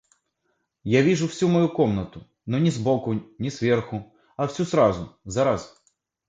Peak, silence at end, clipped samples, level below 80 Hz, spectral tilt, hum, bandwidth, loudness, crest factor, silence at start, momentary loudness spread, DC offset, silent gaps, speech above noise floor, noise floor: -6 dBFS; 0.6 s; under 0.1%; -52 dBFS; -6.5 dB/octave; none; 9.2 kHz; -23 LUFS; 18 dB; 0.85 s; 14 LU; under 0.1%; none; 51 dB; -74 dBFS